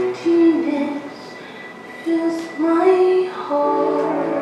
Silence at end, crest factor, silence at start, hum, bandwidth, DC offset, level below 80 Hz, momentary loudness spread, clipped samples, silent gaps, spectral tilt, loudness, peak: 0 s; 14 dB; 0 s; none; 9.8 kHz; under 0.1%; -72 dBFS; 19 LU; under 0.1%; none; -6 dB/octave; -18 LUFS; -4 dBFS